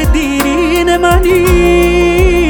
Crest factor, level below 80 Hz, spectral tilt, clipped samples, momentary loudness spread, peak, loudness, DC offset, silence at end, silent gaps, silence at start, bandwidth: 8 dB; -16 dBFS; -5.5 dB/octave; under 0.1%; 3 LU; 0 dBFS; -9 LUFS; under 0.1%; 0 s; none; 0 s; 18.5 kHz